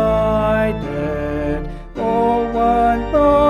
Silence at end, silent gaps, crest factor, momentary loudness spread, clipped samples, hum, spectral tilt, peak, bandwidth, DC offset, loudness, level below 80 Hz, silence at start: 0 s; none; 14 dB; 8 LU; under 0.1%; none; -8 dB/octave; -4 dBFS; 13.5 kHz; under 0.1%; -18 LUFS; -30 dBFS; 0 s